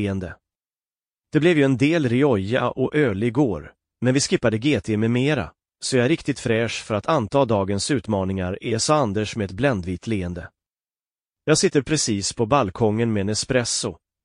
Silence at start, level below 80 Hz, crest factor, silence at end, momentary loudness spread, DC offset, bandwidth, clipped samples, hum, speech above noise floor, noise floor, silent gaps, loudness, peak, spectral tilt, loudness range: 0 s; -50 dBFS; 16 dB; 0.3 s; 8 LU; under 0.1%; 10.5 kHz; under 0.1%; none; over 69 dB; under -90 dBFS; none; -21 LUFS; -6 dBFS; -5 dB/octave; 3 LU